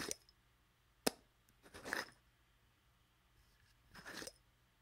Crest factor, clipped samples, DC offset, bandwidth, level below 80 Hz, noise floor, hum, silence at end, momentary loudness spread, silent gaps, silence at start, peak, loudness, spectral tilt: 38 dB; under 0.1%; under 0.1%; 16 kHz; -74 dBFS; -75 dBFS; 60 Hz at -80 dBFS; 0.5 s; 18 LU; none; 0 s; -14 dBFS; -46 LUFS; -2 dB/octave